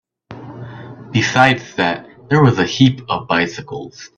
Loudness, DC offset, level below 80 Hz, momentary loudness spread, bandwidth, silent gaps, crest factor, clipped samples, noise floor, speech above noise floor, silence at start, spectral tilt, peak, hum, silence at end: -15 LUFS; under 0.1%; -52 dBFS; 20 LU; 8.2 kHz; none; 18 dB; under 0.1%; -36 dBFS; 20 dB; 0.3 s; -5.5 dB/octave; 0 dBFS; none; 0.1 s